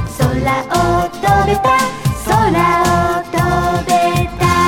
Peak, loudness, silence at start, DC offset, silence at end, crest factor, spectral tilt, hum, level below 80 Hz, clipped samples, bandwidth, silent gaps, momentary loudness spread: 0 dBFS; -14 LUFS; 0 s; under 0.1%; 0 s; 14 dB; -5.5 dB/octave; none; -28 dBFS; under 0.1%; 18.5 kHz; none; 4 LU